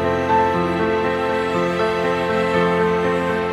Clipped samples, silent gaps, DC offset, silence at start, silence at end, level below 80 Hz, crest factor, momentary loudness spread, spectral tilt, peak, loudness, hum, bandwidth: under 0.1%; none; under 0.1%; 0 s; 0 s; -46 dBFS; 14 dB; 3 LU; -6.5 dB/octave; -6 dBFS; -19 LUFS; none; 13 kHz